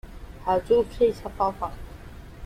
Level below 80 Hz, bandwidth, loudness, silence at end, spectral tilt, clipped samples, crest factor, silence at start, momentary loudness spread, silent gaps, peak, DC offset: -42 dBFS; 14.5 kHz; -25 LUFS; 0 s; -6.5 dB/octave; under 0.1%; 16 dB; 0.05 s; 22 LU; none; -10 dBFS; under 0.1%